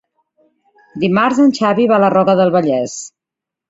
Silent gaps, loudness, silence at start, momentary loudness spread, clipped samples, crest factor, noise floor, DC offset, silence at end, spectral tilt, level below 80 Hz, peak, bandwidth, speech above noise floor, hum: none; -13 LUFS; 0.95 s; 15 LU; under 0.1%; 14 dB; -84 dBFS; under 0.1%; 0.6 s; -6 dB/octave; -58 dBFS; -2 dBFS; 8 kHz; 72 dB; none